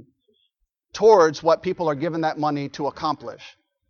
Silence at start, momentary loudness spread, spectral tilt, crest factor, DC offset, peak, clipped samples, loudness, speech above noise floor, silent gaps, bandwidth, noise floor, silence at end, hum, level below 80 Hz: 0.95 s; 14 LU; -5.5 dB/octave; 20 dB; under 0.1%; -2 dBFS; under 0.1%; -21 LUFS; 52 dB; none; 7 kHz; -72 dBFS; 0.4 s; none; -62 dBFS